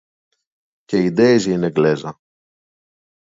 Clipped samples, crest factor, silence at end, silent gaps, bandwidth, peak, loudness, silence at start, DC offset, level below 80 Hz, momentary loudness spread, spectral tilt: under 0.1%; 18 dB; 1.15 s; none; 7.8 kHz; -2 dBFS; -17 LUFS; 0.9 s; under 0.1%; -58 dBFS; 10 LU; -6.5 dB/octave